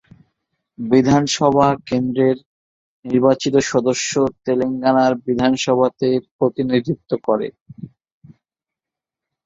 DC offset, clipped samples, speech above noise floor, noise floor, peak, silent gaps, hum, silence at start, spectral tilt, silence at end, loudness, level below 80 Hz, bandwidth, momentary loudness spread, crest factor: under 0.1%; under 0.1%; 70 dB; -87 dBFS; -2 dBFS; 2.46-3.03 s, 6.31-6.39 s, 7.61-7.66 s; none; 0.8 s; -5.5 dB/octave; 1.6 s; -18 LUFS; -54 dBFS; 7.8 kHz; 9 LU; 18 dB